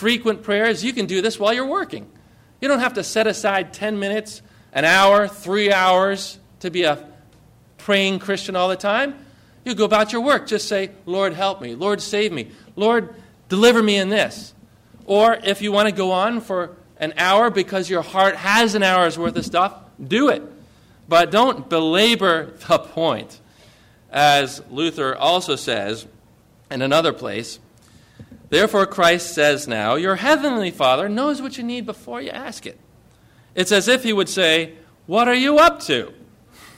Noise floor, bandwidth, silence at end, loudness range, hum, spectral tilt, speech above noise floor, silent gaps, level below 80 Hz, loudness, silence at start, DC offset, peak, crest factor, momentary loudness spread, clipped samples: -53 dBFS; 16 kHz; 0.65 s; 4 LU; none; -3.5 dB/octave; 34 dB; none; -56 dBFS; -18 LUFS; 0 s; under 0.1%; -4 dBFS; 16 dB; 14 LU; under 0.1%